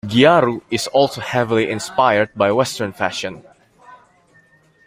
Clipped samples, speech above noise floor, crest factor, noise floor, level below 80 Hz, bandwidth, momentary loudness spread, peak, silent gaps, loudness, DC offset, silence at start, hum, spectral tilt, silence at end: under 0.1%; 37 dB; 18 dB; -54 dBFS; -56 dBFS; 16 kHz; 10 LU; -2 dBFS; none; -17 LUFS; under 0.1%; 0.05 s; none; -4.5 dB/octave; 0.9 s